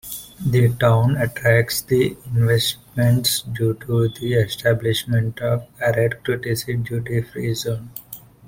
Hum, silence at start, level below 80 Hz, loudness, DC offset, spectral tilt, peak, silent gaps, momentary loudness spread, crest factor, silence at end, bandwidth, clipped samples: none; 0.05 s; -48 dBFS; -20 LUFS; under 0.1%; -5.5 dB/octave; -2 dBFS; none; 8 LU; 18 dB; 0.3 s; 16.5 kHz; under 0.1%